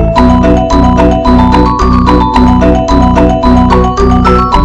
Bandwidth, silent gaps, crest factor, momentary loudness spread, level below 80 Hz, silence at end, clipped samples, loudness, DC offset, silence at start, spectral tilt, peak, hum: 8.8 kHz; none; 6 dB; 1 LU; -12 dBFS; 0 s; under 0.1%; -7 LUFS; under 0.1%; 0 s; -7.5 dB/octave; 0 dBFS; 60 Hz at -20 dBFS